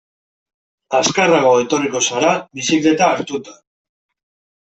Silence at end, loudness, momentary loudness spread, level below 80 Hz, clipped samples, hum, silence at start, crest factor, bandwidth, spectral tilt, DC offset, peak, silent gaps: 1.1 s; -15 LUFS; 8 LU; -60 dBFS; under 0.1%; none; 0.9 s; 16 dB; 8.4 kHz; -3 dB/octave; under 0.1%; -2 dBFS; none